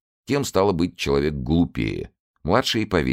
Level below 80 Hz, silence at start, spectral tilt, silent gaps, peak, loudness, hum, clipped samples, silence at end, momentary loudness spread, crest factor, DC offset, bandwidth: -38 dBFS; 0.3 s; -5.5 dB/octave; 2.20-2.34 s; -4 dBFS; -22 LUFS; none; under 0.1%; 0 s; 9 LU; 20 dB; under 0.1%; 16 kHz